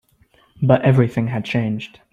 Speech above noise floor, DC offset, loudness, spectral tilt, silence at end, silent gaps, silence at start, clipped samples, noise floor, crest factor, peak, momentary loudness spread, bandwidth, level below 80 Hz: 39 dB; under 0.1%; -18 LUFS; -8.5 dB/octave; 0.25 s; none; 0.6 s; under 0.1%; -56 dBFS; 18 dB; -2 dBFS; 10 LU; 7.2 kHz; -52 dBFS